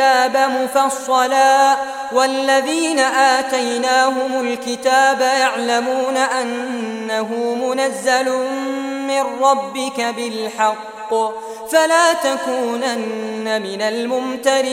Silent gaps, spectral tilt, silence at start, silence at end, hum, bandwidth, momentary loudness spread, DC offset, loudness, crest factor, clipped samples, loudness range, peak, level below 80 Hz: none; -2 dB/octave; 0 s; 0 s; none; 16.5 kHz; 9 LU; under 0.1%; -17 LUFS; 16 dB; under 0.1%; 4 LU; -2 dBFS; -66 dBFS